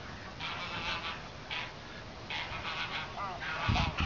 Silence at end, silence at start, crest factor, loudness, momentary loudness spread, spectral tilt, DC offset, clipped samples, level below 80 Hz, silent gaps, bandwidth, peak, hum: 0 s; 0 s; 20 dB; -37 LUFS; 12 LU; -2.5 dB/octave; 0.1%; under 0.1%; -48 dBFS; none; 7.6 kHz; -18 dBFS; none